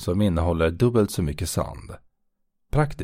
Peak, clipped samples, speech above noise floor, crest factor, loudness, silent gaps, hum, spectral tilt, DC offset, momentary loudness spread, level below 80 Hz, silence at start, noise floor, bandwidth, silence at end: -6 dBFS; under 0.1%; 48 dB; 18 dB; -24 LUFS; none; none; -6.5 dB/octave; under 0.1%; 12 LU; -36 dBFS; 0 s; -71 dBFS; 16 kHz; 0 s